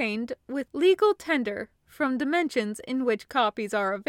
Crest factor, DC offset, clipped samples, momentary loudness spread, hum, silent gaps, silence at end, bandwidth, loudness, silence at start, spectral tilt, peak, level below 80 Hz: 16 dB; under 0.1%; under 0.1%; 10 LU; none; none; 0.05 s; 16 kHz; -26 LUFS; 0 s; -4.5 dB/octave; -10 dBFS; -66 dBFS